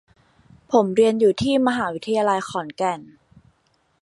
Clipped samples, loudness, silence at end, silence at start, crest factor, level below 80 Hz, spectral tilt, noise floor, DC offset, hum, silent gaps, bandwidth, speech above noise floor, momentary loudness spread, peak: under 0.1%; -20 LUFS; 1 s; 0.7 s; 18 dB; -56 dBFS; -5.5 dB/octave; -65 dBFS; under 0.1%; none; none; 11.5 kHz; 45 dB; 9 LU; -4 dBFS